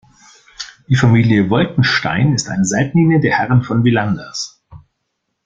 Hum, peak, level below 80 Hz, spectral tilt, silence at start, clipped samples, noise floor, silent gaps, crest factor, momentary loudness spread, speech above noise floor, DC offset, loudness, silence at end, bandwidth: none; -2 dBFS; -46 dBFS; -5.5 dB/octave; 0.6 s; under 0.1%; -72 dBFS; none; 14 dB; 13 LU; 59 dB; under 0.1%; -14 LUFS; 0.7 s; 9.4 kHz